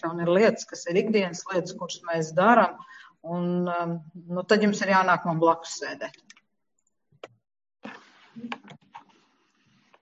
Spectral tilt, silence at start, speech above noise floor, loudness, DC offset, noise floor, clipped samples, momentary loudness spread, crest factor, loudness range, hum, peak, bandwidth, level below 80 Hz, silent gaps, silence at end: -5.5 dB/octave; 0.05 s; 53 dB; -25 LUFS; under 0.1%; -78 dBFS; under 0.1%; 20 LU; 20 dB; 21 LU; none; -6 dBFS; 8 kHz; -74 dBFS; none; 1.05 s